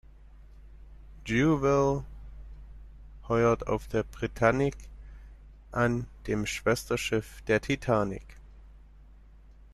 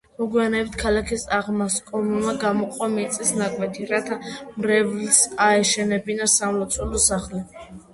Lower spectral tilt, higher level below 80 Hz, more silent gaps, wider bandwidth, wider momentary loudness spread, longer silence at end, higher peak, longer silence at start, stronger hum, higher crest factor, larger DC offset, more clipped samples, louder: first, -6 dB/octave vs -3 dB/octave; about the same, -46 dBFS vs -44 dBFS; neither; first, 13.5 kHz vs 12 kHz; first, 23 LU vs 10 LU; first, 0.95 s vs 0.1 s; second, -8 dBFS vs 0 dBFS; about the same, 0.2 s vs 0.2 s; neither; about the same, 22 dB vs 22 dB; neither; neither; second, -28 LUFS vs -21 LUFS